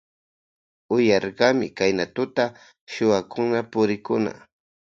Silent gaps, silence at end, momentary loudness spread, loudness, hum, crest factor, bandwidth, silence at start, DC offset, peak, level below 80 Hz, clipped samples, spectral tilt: 2.81-2.87 s; 0.5 s; 6 LU; -23 LUFS; none; 22 dB; 7.6 kHz; 0.9 s; under 0.1%; -2 dBFS; -62 dBFS; under 0.1%; -5.5 dB/octave